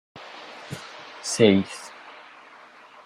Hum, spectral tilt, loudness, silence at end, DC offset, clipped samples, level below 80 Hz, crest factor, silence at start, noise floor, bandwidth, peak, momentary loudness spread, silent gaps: none; -4.5 dB/octave; -22 LUFS; 0.95 s; under 0.1%; under 0.1%; -68 dBFS; 24 dB; 0.15 s; -49 dBFS; 15.5 kHz; -2 dBFS; 26 LU; none